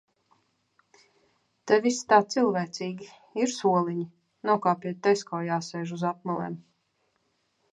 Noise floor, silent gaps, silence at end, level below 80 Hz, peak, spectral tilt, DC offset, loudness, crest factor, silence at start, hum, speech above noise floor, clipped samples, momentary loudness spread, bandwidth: -73 dBFS; none; 1.15 s; -76 dBFS; -6 dBFS; -5 dB/octave; under 0.1%; -27 LUFS; 22 dB; 1.65 s; none; 47 dB; under 0.1%; 15 LU; 10.5 kHz